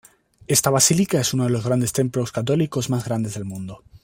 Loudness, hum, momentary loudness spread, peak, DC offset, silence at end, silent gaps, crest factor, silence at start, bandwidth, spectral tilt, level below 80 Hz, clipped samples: -20 LUFS; none; 13 LU; -2 dBFS; under 0.1%; 0.05 s; none; 20 dB; 0.5 s; 16.5 kHz; -4.5 dB/octave; -54 dBFS; under 0.1%